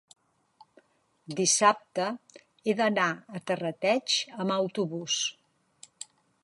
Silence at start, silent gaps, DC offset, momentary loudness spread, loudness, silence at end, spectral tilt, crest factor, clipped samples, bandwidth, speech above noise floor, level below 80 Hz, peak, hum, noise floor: 1.3 s; none; under 0.1%; 18 LU; -28 LUFS; 1.1 s; -2.5 dB/octave; 24 dB; under 0.1%; 11.5 kHz; 38 dB; -80 dBFS; -6 dBFS; none; -66 dBFS